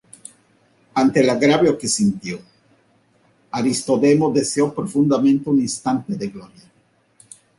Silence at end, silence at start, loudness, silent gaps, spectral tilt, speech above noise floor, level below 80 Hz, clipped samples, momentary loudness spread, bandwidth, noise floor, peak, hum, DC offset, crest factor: 1.15 s; 0.95 s; -18 LUFS; none; -5 dB/octave; 42 dB; -58 dBFS; under 0.1%; 15 LU; 11.5 kHz; -60 dBFS; -4 dBFS; none; under 0.1%; 16 dB